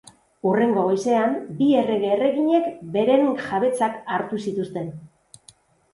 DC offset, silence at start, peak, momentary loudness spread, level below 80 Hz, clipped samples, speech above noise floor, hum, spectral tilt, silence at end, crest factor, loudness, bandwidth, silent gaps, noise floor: under 0.1%; 0.45 s; -6 dBFS; 8 LU; -66 dBFS; under 0.1%; 33 dB; none; -6.5 dB/octave; 0.9 s; 16 dB; -22 LUFS; 11.5 kHz; none; -54 dBFS